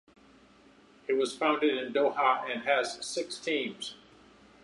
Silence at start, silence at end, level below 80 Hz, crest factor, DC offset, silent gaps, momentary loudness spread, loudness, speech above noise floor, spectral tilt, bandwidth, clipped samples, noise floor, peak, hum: 1.1 s; 0.7 s; -74 dBFS; 20 dB; under 0.1%; none; 10 LU; -30 LUFS; 29 dB; -2.5 dB/octave; 11.5 kHz; under 0.1%; -59 dBFS; -10 dBFS; none